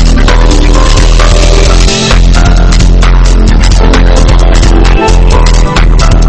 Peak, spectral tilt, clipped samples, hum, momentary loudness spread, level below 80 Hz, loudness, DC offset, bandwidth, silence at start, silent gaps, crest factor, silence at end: 0 dBFS; -5 dB/octave; 6%; none; 1 LU; -4 dBFS; -6 LUFS; 3%; 8.8 kHz; 0 s; none; 2 dB; 0 s